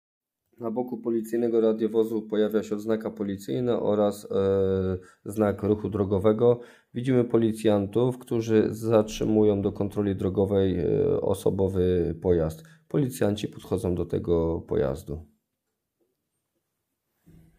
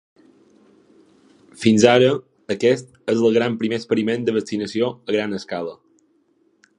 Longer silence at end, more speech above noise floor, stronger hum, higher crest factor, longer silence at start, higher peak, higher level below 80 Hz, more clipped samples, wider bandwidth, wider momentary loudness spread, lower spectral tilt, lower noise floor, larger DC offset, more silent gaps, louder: first, 2.35 s vs 1.05 s; first, 57 dB vs 43 dB; neither; about the same, 20 dB vs 20 dB; second, 0.6 s vs 1.6 s; second, -6 dBFS vs 0 dBFS; first, -50 dBFS vs -62 dBFS; neither; first, 16 kHz vs 10.5 kHz; second, 8 LU vs 13 LU; first, -7.5 dB/octave vs -5.5 dB/octave; first, -82 dBFS vs -62 dBFS; neither; neither; second, -26 LUFS vs -20 LUFS